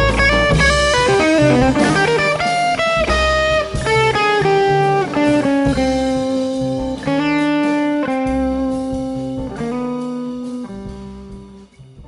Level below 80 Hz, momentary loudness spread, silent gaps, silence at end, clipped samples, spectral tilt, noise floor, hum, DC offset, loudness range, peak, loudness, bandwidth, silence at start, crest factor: -30 dBFS; 12 LU; none; 0 s; under 0.1%; -5 dB/octave; -40 dBFS; none; under 0.1%; 8 LU; -2 dBFS; -16 LUFS; 11.5 kHz; 0 s; 14 dB